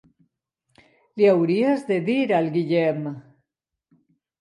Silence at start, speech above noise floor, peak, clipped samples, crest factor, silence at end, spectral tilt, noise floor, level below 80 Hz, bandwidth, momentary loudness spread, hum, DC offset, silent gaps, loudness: 1.15 s; 63 dB; -6 dBFS; under 0.1%; 18 dB; 1.2 s; -8 dB/octave; -84 dBFS; -74 dBFS; 11 kHz; 15 LU; none; under 0.1%; none; -21 LUFS